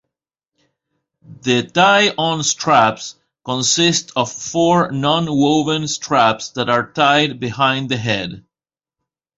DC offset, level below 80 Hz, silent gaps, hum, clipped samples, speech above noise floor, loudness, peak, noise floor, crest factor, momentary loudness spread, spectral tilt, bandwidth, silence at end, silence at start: under 0.1%; -56 dBFS; none; none; under 0.1%; over 74 dB; -16 LUFS; 0 dBFS; under -90 dBFS; 18 dB; 8 LU; -3.5 dB/octave; 8 kHz; 1 s; 1.3 s